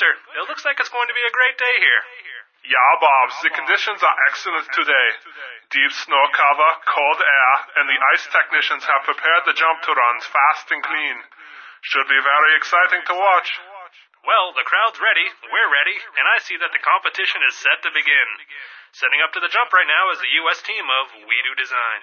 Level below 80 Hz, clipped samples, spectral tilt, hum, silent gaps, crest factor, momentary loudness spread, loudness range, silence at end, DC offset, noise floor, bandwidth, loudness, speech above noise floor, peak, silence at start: -88 dBFS; under 0.1%; 1 dB/octave; none; none; 16 dB; 8 LU; 2 LU; 0 s; under 0.1%; -42 dBFS; 6.8 kHz; -16 LUFS; 24 dB; -2 dBFS; 0 s